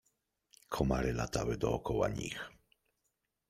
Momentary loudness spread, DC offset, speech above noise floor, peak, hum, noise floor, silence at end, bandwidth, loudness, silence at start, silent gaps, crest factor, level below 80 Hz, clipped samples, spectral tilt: 10 LU; under 0.1%; 49 dB; -14 dBFS; none; -84 dBFS; 1 s; 16 kHz; -36 LUFS; 0.7 s; none; 22 dB; -48 dBFS; under 0.1%; -5.5 dB/octave